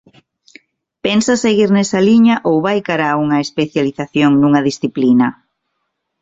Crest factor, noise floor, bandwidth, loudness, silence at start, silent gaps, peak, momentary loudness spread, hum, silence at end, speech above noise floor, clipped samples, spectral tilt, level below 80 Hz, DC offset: 12 dB; -72 dBFS; 8 kHz; -14 LUFS; 1.05 s; none; -2 dBFS; 7 LU; none; 0.9 s; 59 dB; under 0.1%; -5.5 dB/octave; -54 dBFS; under 0.1%